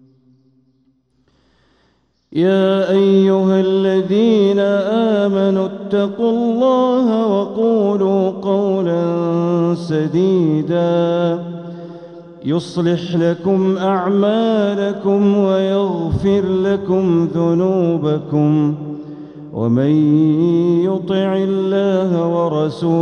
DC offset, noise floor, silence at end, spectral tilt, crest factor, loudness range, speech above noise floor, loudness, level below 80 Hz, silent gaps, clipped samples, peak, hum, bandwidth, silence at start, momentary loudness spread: under 0.1%; -60 dBFS; 0 s; -8.5 dB/octave; 14 dB; 4 LU; 46 dB; -16 LUFS; -50 dBFS; none; under 0.1%; -2 dBFS; none; 8.6 kHz; 2.3 s; 6 LU